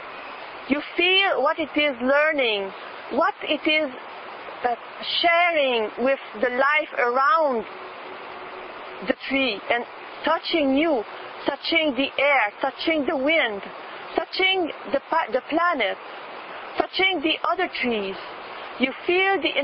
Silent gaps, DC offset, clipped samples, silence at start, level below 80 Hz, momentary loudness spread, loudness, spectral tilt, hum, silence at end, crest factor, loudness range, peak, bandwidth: none; under 0.1%; under 0.1%; 0 s; -62 dBFS; 17 LU; -22 LUFS; -7.5 dB/octave; none; 0 s; 20 dB; 4 LU; -4 dBFS; 5.8 kHz